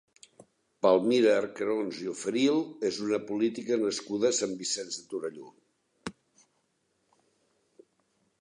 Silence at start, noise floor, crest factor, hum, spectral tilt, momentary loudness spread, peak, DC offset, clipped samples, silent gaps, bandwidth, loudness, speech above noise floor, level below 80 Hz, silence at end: 0.85 s; -75 dBFS; 20 dB; none; -3.5 dB/octave; 16 LU; -10 dBFS; under 0.1%; under 0.1%; none; 11 kHz; -29 LUFS; 47 dB; -74 dBFS; 2.3 s